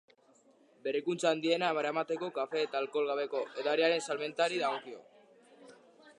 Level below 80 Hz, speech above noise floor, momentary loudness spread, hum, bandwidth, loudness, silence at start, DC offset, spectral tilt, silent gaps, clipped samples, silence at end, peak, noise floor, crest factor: -90 dBFS; 33 dB; 7 LU; none; 11 kHz; -33 LUFS; 0.85 s; under 0.1%; -3.5 dB/octave; none; under 0.1%; 0.05 s; -16 dBFS; -65 dBFS; 20 dB